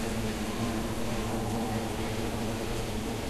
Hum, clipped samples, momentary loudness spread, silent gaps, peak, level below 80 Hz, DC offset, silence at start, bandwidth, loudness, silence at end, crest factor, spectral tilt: none; under 0.1%; 2 LU; none; -18 dBFS; -42 dBFS; under 0.1%; 0 s; 14 kHz; -33 LUFS; 0 s; 14 dB; -5 dB/octave